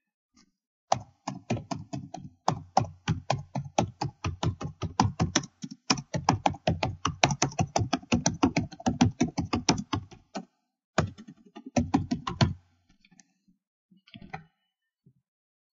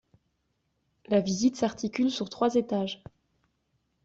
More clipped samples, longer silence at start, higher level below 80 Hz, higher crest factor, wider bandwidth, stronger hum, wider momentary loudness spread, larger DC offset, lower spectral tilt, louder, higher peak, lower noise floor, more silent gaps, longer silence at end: neither; second, 0.9 s vs 1.1 s; first, -50 dBFS vs -66 dBFS; first, 28 dB vs 18 dB; about the same, 8 kHz vs 8 kHz; neither; first, 16 LU vs 5 LU; neither; about the same, -4.5 dB/octave vs -5 dB/octave; about the same, -30 LUFS vs -28 LUFS; first, -2 dBFS vs -12 dBFS; first, -82 dBFS vs -76 dBFS; first, 10.84-10.93 s, 13.67-13.89 s vs none; first, 1.3 s vs 1.1 s